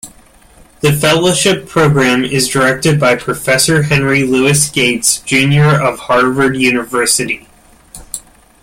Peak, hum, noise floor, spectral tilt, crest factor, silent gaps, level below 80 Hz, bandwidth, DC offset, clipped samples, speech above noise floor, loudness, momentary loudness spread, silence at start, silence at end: 0 dBFS; none; -43 dBFS; -4 dB/octave; 12 dB; none; -42 dBFS; 16.5 kHz; under 0.1%; under 0.1%; 32 dB; -11 LUFS; 5 LU; 0.05 s; 0.45 s